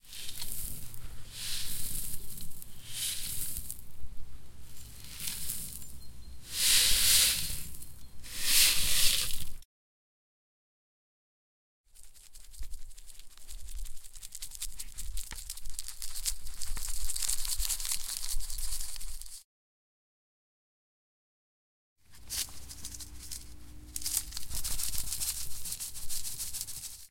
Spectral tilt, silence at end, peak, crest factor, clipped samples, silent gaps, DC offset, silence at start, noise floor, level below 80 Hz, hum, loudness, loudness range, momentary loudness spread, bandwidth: 0.5 dB/octave; 0 s; -8 dBFS; 24 dB; under 0.1%; 9.65-11.84 s, 19.44-21.96 s; 0.3%; 0 s; under -90 dBFS; -44 dBFS; none; -31 LUFS; 18 LU; 26 LU; 17 kHz